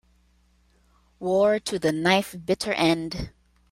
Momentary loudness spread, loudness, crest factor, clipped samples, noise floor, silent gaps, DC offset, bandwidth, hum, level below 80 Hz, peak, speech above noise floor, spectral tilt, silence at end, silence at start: 12 LU; -24 LUFS; 20 dB; under 0.1%; -62 dBFS; none; under 0.1%; 16 kHz; none; -50 dBFS; -6 dBFS; 39 dB; -4.5 dB/octave; 0.45 s; 1.2 s